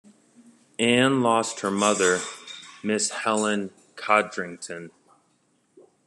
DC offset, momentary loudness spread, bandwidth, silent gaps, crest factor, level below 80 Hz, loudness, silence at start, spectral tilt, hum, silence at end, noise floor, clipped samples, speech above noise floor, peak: under 0.1%; 18 LU; 12.5 kHz; none; 20 dB; -68 dBFS; -23 LUFS; 0.8 s; -3 dB/octave; none; 1.2 s; -67 dBFS; under 0.1%; 44 dB; -6 dBFS